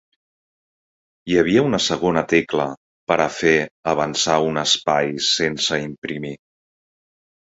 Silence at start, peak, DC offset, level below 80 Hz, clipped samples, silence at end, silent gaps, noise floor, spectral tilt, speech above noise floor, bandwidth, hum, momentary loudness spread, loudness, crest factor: 1.25 s; 0 dBFS; under 0.1%; -52 dBFS; under 0.1%; 1.1 s; 2.77-3.07 s, 3.71-3.83 s, 5.98-6.02 s; under -90 dBFS; -3.5 dB/octave; over 71 dB; 8 kHz; none; 12 LU; -19 LUFS; 20 dB